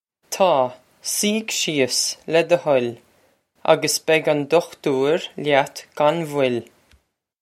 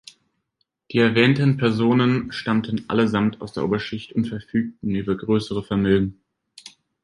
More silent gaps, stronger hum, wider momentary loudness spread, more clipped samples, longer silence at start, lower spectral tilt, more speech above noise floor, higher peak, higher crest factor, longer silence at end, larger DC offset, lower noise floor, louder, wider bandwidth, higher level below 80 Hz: neither; neither; about the same, 8 LU vs 9 LU; neither; second, 0.3 s vs 0.9 s; second, -3 dB/octave vs -7.5 dB/octave; second, 41 dB vs 53 dB; about the same, 0 dBFS vs -2 dBFS; about the same, 20 dB vs 20 dB; first, 0.8 s vs 0.35 s; neither; second, -61 dBFS vs -74 dBFS; about the same, -20 LUFS vs -21 LUFS; first, 16 kHz vs 11 kHz; second, -70 dBFS vs -50 dBFS